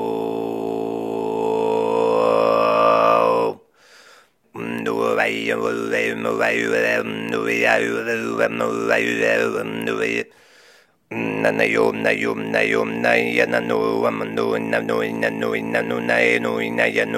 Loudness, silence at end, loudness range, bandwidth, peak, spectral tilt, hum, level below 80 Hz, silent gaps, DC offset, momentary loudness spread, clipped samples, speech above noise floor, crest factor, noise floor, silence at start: -20 LUFS; 0 s; 3 LU; 16 kHz; -2 dBFS; -5 dB/octave; none; -66 dBFS; none; under 0.1%; 8 LU; under 0.1%; 33 dB; 18 dB; -53 dBFS; 0 s